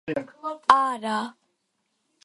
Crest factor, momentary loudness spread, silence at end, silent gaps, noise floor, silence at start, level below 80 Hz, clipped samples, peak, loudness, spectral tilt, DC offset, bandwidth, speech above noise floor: 26 dB; 15 LU; 0.95 s; none; -75 dBFS; 0.05 s; -66 dBFS; under 0.1%; 0 dBFS; -24 LUFS; -4 dB/octave; under 0.1%; 11.5 kHz; 51 dB